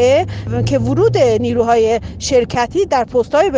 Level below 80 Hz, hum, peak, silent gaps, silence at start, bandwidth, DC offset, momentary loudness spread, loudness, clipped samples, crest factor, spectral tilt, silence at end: -36 dBFS; none; -2 dBFS; none; 0 s; 9.8 kHz; under 0.1%; 4 LU; -15 LUFS; under 0.1%; 12 dB; -5.5 dB/octave; 0 s